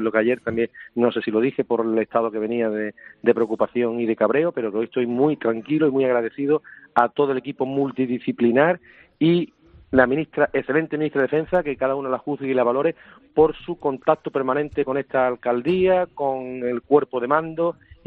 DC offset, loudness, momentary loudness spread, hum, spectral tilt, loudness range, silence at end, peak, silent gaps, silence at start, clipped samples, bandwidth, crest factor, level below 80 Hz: under 0.1%; -22 LUFS; 6 LU; none; -5.5 dB/octave; 1 LU; 0.35 s; -2 dBFS; none; 0 s; under 0.1%; 4.5 kHz; 20 dB; -56 dBFS